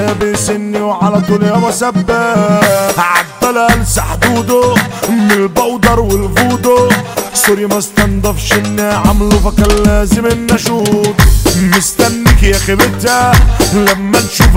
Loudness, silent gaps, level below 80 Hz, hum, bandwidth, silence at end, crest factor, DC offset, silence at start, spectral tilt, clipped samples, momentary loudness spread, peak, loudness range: -10 LUFS; none; -18 dBFS; none; 16.5 kHz; 0 s; 10 dB; 0.5%; 0 s; -4.5 dB/octave; 0.1%; 4 LU; 0 dBFS; 2 LU